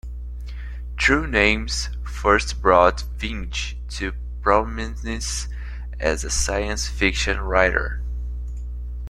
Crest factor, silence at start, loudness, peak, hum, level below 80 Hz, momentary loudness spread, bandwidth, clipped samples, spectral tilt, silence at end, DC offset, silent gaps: 20 dB; 0.05 s; -22 LUFS; -2 dBFS; 60 Hz at -30 dBFS; -28 dBFS; 16 LU; 13 kHz; under 0.1%; -4 dB/octave; 0 s; under 0.1%; none